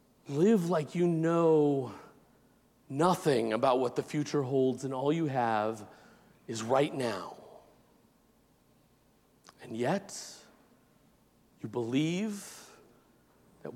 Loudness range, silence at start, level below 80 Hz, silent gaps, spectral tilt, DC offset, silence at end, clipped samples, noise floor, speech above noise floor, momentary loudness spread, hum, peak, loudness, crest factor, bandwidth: 11 LU; 0.25 s; -76 dBFS; none; -6 dB/octave; under 0.1%; 0 s; under 0.1%; -67 dBFS; 37 dB; 18 LU; none; -14 dBFS; -30 LUFS; 18 dB; 16.5 kHz